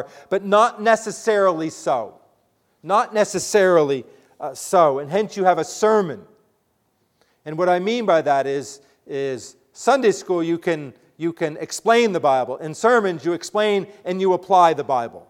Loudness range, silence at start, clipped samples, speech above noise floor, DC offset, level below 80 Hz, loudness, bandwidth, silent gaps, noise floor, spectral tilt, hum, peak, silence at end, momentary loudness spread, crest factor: 4 LU; 0 s; under 0.1%; 48 dB; under 0.1%; -70 dBFS; -20 LUFS; 16 kHz; none; -67 dBFS; -4.5 dB/octave; none; -2 dBFS; 0.1 s; 12 LU; 18 dB